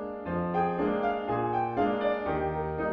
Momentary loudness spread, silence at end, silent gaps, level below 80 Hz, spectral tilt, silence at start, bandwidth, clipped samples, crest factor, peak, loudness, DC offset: 4 LU; 0 s; none; -50 dBFS; -9.5 dB/octave; 0 s; 5.8 kHz; under 0.1%; 14 dB; -16 dBFS; -29 LUFS; under 0.1%